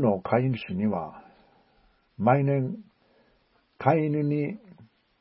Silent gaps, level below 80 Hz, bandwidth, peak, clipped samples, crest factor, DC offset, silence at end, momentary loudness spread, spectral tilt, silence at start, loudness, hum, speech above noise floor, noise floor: none; -62 dBFS; 5.8 kHz; -6 dBFS; under 0.1%; 22 dB; under 0.1%; 0.45 s; 11 LU; -12.5 dB/octave; 0 s; -26 LUFS; none; 41 dB; -66 dBFS